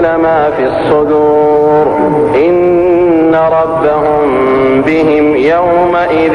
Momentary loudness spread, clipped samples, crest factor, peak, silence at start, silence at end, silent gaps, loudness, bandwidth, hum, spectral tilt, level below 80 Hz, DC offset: 2 LU; under 0.1%; 8 dB; 0 dBFS; 0 s; 0 s; none; -9 LUFS; 9.6 kHz; none; -8 dB/octave; -38 dBFS; 0.2%